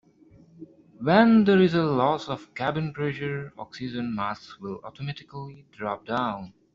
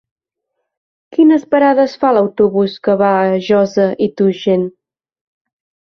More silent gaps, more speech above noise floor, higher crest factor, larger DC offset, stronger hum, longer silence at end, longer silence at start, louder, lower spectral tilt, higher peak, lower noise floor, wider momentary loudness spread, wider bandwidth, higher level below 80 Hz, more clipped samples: neither; second, 30 dB vs 62 dB; first, 22 dB vs 14 dB; neither; neither; second, 0.25 s vs 1.25 s; second, 0.6 s vs 1.2 s; second, -25 LUFS vs -13 LUFS; second, -5.5 dB/octave vs -7.5 dB/octave; about the same, -4 dBFS vs -2 dBFS; second, -55 dBFS vs -74 dBFS; first, 20 LU vs 5 LU; first, 7.4 kHz vs 6.4 kHz; second, -62 dBFS vs -56 dBFS; neither